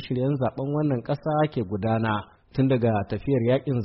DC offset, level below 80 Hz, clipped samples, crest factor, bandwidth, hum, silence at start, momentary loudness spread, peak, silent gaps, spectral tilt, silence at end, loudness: under 0.1%; -52 dBFS; under 0.1%; 14 dB; 5.8 kHz; none; 0 s; 5 LU; -10 dBFS; none; -7.5 dB/octave; 0 s; -25 LUFS